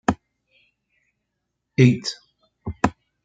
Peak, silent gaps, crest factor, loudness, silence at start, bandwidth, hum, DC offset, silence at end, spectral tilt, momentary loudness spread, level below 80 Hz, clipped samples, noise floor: -2 dBFS; none; 22 dB; -21 LUFS; 0.1 s; 9 kHz; none; under 0.1%; 0.35 s; -6.5 dB/octave; 20 LU; -50 dBFS; under 0.1%; -79 dBFS